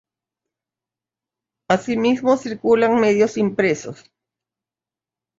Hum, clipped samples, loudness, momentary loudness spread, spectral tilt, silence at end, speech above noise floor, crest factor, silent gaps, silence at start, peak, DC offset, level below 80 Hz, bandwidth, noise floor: none; under 0.1%; -18 LUFS; 6 LU; -5.5 dB/octave; 1.45 s; 72 dB; 20 dB; none; 1.7 s; -2 dBFS; under 0.1%; -62 dBFS; 7.8 kHz; -90 dBFS